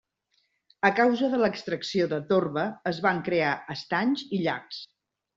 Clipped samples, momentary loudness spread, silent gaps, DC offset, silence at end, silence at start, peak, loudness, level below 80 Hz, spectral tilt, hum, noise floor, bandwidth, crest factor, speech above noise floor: under 0.1%; 9 LU; none; under 0.1%; 0.5 s; 0.85 s; -6 dBFS; -26 LUFS; -68 dBFS; -6 dB/octave; none; -73 dBFS; 7.8 kHz; 22 dB; 47 dB